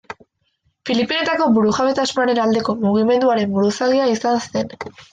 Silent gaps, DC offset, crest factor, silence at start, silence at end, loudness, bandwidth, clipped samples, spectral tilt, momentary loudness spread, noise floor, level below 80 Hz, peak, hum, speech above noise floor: none; under 0.1%; 14 dB; 0.1 s; 0.1 s; -17 LUFS; 9.4 kHz; under 0.1%; -5 dB/octave; 11 LU; -66 dBFS; -58 dBFS; -4 dBFS; none; 49 dB